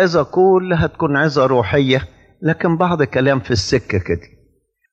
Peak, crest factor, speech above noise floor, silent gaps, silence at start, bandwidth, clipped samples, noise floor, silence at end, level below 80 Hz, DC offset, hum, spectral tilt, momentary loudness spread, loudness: -2 dBFS; 14 dB; 44 dB; none; 0 s; 8.4 kHz; under 0.1%; -60 dBFS; 0.7 s; -40 dBFS; under 0.1%; none; -6 dB/octave; 7 LU; -16 LUFS